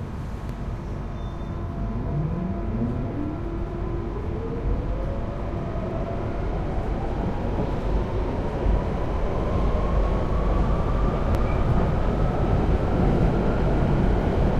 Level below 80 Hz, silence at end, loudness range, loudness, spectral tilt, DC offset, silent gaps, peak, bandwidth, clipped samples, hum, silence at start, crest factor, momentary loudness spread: -28 dBFS; 0 s; 6 LU; -26 LUFS; -9 dB/octave; under 0.1%; none; -10 dBFS; 6.8 kHz; under 0.1%; none; 0 s; 14 dB; 9 LU